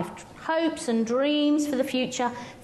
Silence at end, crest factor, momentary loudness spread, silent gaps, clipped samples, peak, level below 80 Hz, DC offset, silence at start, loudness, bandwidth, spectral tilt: 0 s; 14 dB; 7 LU; none; under 0.1%; -12 dBFS; -64 dBFS; under 0.1%; 0 s; -26 LUFS; 12.5 kHz; -4 dB/octave